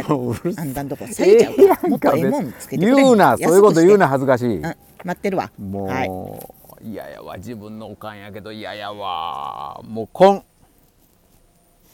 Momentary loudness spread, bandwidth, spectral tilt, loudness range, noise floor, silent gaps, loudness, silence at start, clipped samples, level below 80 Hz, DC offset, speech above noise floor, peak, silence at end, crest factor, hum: 22 LU; 17.5 kHz; -6 dB/octave; 16 LU; -56 dBFS; none; -17 LUFS; 0 s; under 0.1%; -54 dBFS; under 0.1%; 38 dB; 0 dBFS; 1.55 s; 18 dB; none